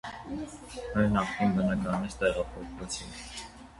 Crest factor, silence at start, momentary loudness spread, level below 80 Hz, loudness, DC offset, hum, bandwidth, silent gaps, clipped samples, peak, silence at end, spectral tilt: 18 dB; 0.05 s; 14 LU; -48 dBFS; -31 LUFS; under 0.1%; none; 11.5 kHz; none; under 0.1%; -12 dBFS; 0 s; -5.5 dB/octave